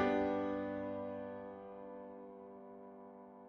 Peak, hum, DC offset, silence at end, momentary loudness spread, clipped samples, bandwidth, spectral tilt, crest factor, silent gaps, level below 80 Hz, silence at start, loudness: -22 dBFS; none; under 0.1%; 0 s; 18 LU; under 0.1%; 6.4 kHz; -5 dB/octave; 20 dB; none; -70 dBFS; 0 s; -42 LUFS